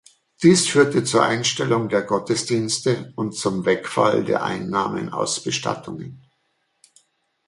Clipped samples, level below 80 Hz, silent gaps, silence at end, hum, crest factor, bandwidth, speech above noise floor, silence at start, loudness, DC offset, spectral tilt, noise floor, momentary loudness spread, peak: under 0.1%; -60 dBFS; none; 1.3 s; none; 20 dB; 11.5 kHz; 49 dB; 0.4 s; -20 LUFS; under 0.1%; -4 dB/octave; -70 dBFS; 9 LU; -2 dBFS